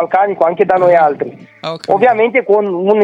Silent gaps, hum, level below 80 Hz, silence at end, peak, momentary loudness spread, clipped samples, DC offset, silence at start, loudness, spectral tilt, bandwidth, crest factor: none; none; -60 dBFS; 0 s; 0 dBFS; 14 LU; under 0.1%; under 0.1%; 0 s; -12 LUFS; -7 dB/octave; 9.6 kHz; 12 dB